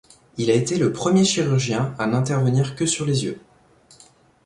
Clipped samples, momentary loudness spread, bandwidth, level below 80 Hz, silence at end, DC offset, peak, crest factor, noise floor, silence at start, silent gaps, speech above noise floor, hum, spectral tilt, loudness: under 0.1%; 8 LU; 11.5 kHz; -56 dBFS; 1.05 s; under 0.1%; -6 dBFS; 16 dB; -54 dBFS; 0.35 s; none; 33 dB; none; -5 dB/octave; -21 LUFS